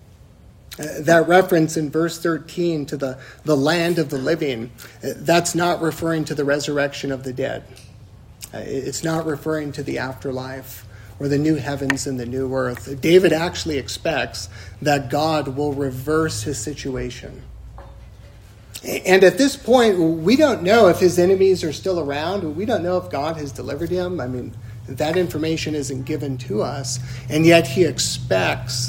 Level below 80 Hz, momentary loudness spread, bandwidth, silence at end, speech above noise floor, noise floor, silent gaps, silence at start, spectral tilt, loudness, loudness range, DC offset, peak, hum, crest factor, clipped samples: -46 dBFS; 16 LU; 16.5 kHz; 0 s; 26 dB; -46 dBFS; none; 0.7 s; -5 dB/octave; -20 LUFS; 9 LU; under 0.1%; 0 dBFS; none; 20 dB; under 0.1%